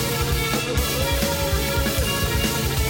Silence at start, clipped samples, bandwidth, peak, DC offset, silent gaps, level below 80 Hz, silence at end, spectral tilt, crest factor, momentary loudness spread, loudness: 0 s; under 0.1%; 17 kHz; -8 dBFS; under 0.1%; none; -28 dBFS; 0 s; -4 dB/octave; 14 dB; 1 LU; -22 LUFS